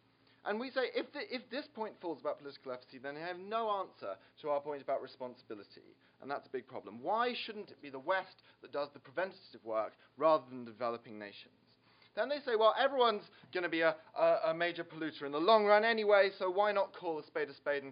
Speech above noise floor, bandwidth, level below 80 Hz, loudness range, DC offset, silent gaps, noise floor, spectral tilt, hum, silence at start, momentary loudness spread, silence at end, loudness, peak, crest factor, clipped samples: 31 dB; 5.2 kHz; under -90 dBFS; 10 LU; under 0.1%; none; -67 dBFS; -1.5 dB/octave; none; 0.45 s; 18 LU; 0 s; -35 LUFS; -14 dBFS; 22 dB; under 0.1%